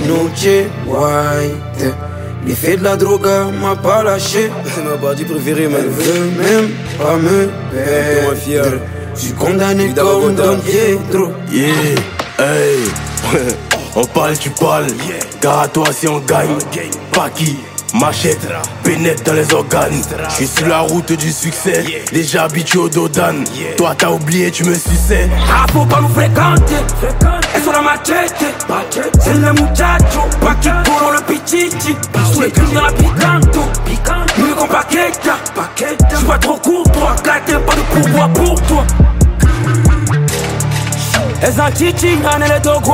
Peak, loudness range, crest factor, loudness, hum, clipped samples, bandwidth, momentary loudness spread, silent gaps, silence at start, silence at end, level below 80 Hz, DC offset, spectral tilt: 0 dBFS; 3 LU; 12 dB; -13 LUFS; none; under 0.1%; 16.5 kHz; 7 LU; none; 0 s; 0 s; -20 dBFS; under 0.1%; -5 dB/octave